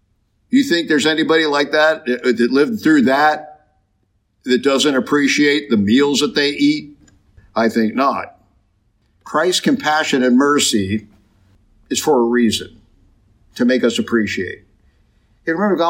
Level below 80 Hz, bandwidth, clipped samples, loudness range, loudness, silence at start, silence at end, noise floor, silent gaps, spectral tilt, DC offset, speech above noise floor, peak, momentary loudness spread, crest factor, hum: -58 dBFS; 16 kHz; under 0.1%; 4 LU; -16 LUFS; 0.5 s; 0 s; -64 dBFS; none; -4 dB/octave; under 0.1%; 48 dB; -4 dBFS; 10 LU; 14 dB; none